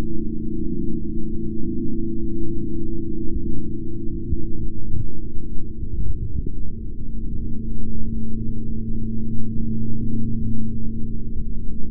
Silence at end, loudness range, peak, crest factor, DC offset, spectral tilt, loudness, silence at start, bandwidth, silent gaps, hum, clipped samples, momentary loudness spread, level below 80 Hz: 0 s; 3 LU; -4 dBFS; 10 dB; under 0.1%; -17 dB/octave; -29 LUFS; 0 s; 0.5 kHz; none; none; under 0.1%; 6 LU; -28 dBFS